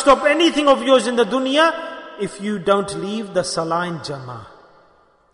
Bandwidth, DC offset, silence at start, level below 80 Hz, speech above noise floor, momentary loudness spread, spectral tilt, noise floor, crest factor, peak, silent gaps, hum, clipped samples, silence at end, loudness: 11 kHz; under 0.1%; 0 s; -52 dBFS; 37 dB; 15 LU; -4 dB/octave; -55 dBFS; 18 dB; -2 dBFS; none; none; under 0.1%; 0.85 s; -18 LUFS